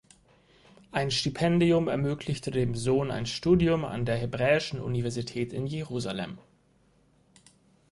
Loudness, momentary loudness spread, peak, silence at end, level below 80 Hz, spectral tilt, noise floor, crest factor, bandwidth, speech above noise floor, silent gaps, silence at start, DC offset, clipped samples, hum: -28 LUFS; 10 LU; -10 dBFS; 1.55 s; -52 dBFS; -6 dB/octave; -65 dBFS; 18 dB; 11.5 kHz; 37 dB; none; 0.95 s; under 0.1%; under 0.1%; none